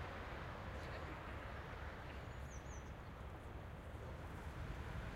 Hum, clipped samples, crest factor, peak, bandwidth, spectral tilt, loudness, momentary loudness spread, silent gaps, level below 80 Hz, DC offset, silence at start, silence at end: none; under 0.1%; 14 dB; -36 dBFS; 16 kHz; -6 dB/octave; -51 LUFS; 4 LU; none; -54 dBFS; under 0.1%; 0 s; 0 s